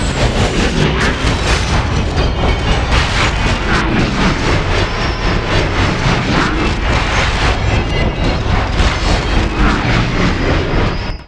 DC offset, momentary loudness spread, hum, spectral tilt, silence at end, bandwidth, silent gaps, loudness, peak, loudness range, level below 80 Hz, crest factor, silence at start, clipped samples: under 0.1%; 3 LU; none; -5 dB/octave; 0 s; 11 kHz; none; -14 LUFS; 0 dBFS; 0 LU; -18 dBFS; 14 dB; 0 s; under 0.1%